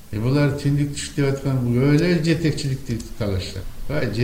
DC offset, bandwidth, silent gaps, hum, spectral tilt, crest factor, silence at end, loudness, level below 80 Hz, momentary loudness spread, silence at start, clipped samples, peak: under 0.1%; 16 kHz; none; none; -6.5 dB/octave; 16 dB; 0 s; -21 LUFS; -38 dBFS; 10 LU; 0 s; under 0.1%; -4 dBFS